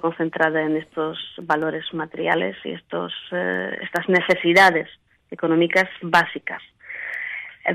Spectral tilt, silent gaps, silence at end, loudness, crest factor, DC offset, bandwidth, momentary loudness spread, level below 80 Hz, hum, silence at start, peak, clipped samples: -5 dB/octave; none; 0 s; -21 LUFS; 18 dB; under 0.1%; 15.5 kHz; 15 LU; -64 dBFS; none; 0.05 s; -4 dBFS; under 0.1%